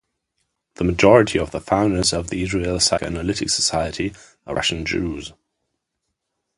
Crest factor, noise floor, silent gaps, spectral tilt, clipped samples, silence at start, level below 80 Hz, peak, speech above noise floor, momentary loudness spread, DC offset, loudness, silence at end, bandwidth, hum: 22 dB; -78 dBFS; none; -4 dB/octave; under 0.1%; 0.8 s; -40 dBFS; 0 dBFS; 58 dB; 14 LU; under 0.1%; -20 LUFS; 1.25 s; 11.5 kHz; none